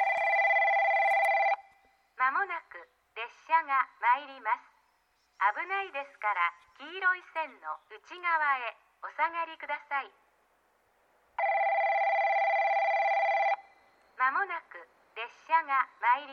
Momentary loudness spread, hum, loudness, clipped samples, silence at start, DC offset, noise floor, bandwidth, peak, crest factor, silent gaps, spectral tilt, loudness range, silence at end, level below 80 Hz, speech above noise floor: 17 LU; none; -29 LUFS; under 0.1%; 0 s; under 0.1%; -72 dBFS; 11.5 kHz; -14 dBFS; 18 dB; none; -1 dB/octave; 5 LU; 0 s; -86 dBFS; 39 dB